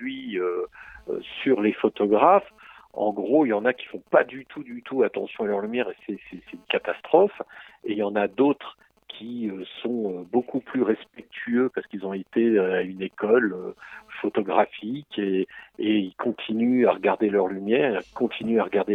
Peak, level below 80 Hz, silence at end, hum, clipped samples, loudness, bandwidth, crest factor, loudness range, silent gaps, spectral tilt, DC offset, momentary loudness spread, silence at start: -4 dBFS; -68 dBFS; 0 s; none; under 0.1%; -24 LUFS; 4.6 kHz; 22 dB; 5 LU; none; -8 dB/octave; under 0.1%; 16 LU; 0 s